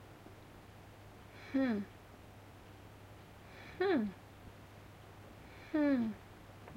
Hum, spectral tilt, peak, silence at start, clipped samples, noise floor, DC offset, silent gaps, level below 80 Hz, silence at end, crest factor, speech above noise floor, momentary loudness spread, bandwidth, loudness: none; -7 dB/octave; -24 dBFS; 0 s; under 0.1%; -56 dBFS; under 0.1%; none; -66 dBFS; 0 s; 18 dB; 22 dB; 22 LU; 16.5 kHz; -36 LUFS